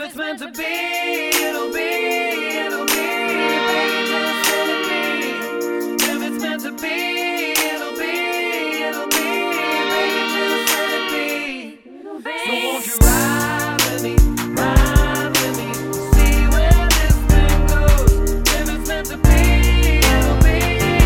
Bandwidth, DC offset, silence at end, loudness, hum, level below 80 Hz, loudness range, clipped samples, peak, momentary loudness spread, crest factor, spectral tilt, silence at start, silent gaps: 19.5 kHz; under 0.1%; 0 s; -18 LUFS; none; -20 dBFS; 4 LU; under 0.1%; 0 dBFS; 9 LU; 16 dB; -4 dB/octave; 0 s; none